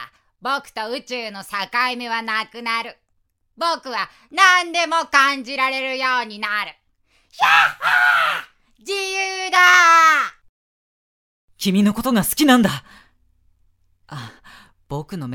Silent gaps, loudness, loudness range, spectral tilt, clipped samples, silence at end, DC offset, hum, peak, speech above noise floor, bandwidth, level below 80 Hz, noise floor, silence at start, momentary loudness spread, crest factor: 10.49-11.48 s; -17 LUFS; 9 LU; -3 dB/octave; under 0.1%; 0 s; under 0.1%; none; 0 dBFS; 49 dB; 17 kHz; -56 dBFS; -67 dBFS; 0 s; 16 LU; 20 dB